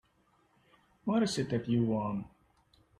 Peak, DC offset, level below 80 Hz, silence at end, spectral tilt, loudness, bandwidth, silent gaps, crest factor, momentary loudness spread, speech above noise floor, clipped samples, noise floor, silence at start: -18 dBFS; under 0.1%; -66 dBFS; 0.7 s; -6 dB/octave; -32 LUFS; 12 kHz; none; 16 dB; 11 LU; 39 dB; under 0.1%; -70 dBFS; 1.05 s